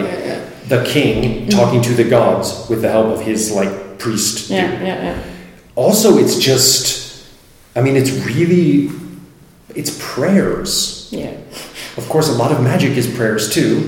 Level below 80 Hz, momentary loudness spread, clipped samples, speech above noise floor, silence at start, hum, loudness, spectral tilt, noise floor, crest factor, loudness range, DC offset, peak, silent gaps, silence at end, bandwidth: -42 dBFS; 16 LU; under 0.1%; 29 dB; 0 s; none; -15 LUFS; -4.5 dB/octave; -43 dBFS; 16 dB; 4 LU; under 0.1%; 0 dBFS; none; 0 s; 17 kHz